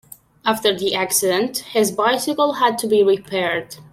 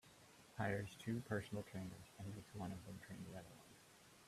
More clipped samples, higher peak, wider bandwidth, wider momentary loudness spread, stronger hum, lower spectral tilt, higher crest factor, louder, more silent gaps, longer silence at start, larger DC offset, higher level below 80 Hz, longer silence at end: neither; first, -4 dBFS vs -28 dBFS; about the same, 16.5 kHz vs 15 kHz; second, 5 LU vs 20 LU; neither; second, -2.5 dB/octave vs -6 dB/octave; second, 16 dB vs 22 dB; first, -19 LUFS vs -49 LUFS; neither; first, 0.45 s vs 0.05 s; neither; first, -62 dBFS vs -74 dBFS; about the same, 0.1 s vs 0 s